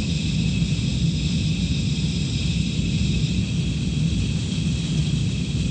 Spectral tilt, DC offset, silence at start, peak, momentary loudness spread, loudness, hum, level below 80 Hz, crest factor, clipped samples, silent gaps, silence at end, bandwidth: -5.5 dB/octave; under 0.1%; 0 s; -10 dBFS; 2 LU; -23 LUFS; none; -30 dBFS; 12 dB; under 0.1%; none; 0 s; 9.4 kHz